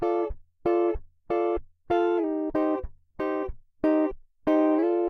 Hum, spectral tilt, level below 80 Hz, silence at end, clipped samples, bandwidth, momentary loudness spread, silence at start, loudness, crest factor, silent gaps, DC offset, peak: none; -8.5 dB/octave; -46 dBFS; 0 s; under 0.1%; 6 kHz; 10 LU; 0 s; -27 LUFS; 14 dB; none; under 0.1%; -12 dBFS